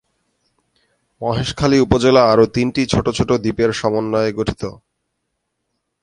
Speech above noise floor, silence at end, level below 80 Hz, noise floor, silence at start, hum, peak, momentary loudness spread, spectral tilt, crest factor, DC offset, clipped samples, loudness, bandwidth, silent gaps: 58 dB; 1.3 s; -38 dBFS; -74 dBFS; 1.2 s; none; 0 dBFS; 11 LU; -6 dB/octave; 18 dB; under 0.1%; under 0.1%; -16 LUFS; 11.5 kHz; none